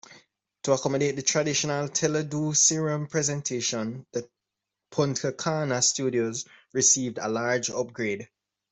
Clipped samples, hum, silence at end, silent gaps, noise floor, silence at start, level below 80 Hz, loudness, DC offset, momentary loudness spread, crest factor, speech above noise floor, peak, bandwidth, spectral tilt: under 0.1%; none; 0.45 s; none; -86 dBFS; 0.1 s; -68 dBFS; -26 LUFS; under 0.1%; 12 LU; 20 dB; 59 dB; -8 dBFS; 8.4 kHz; -3 dB/octave